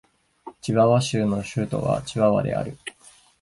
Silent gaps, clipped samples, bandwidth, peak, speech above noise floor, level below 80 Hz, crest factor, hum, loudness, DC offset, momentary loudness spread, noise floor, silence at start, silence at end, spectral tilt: none; under 0.1%; 11.5 kHz; -6 dBFS; 23 dB; -52 dBFS; 18 dB; none; -23 LUFS; under 0.1%; 15 LU; -45 dBFS; 0.45 s; 0.5 s; -6.5 dB/octave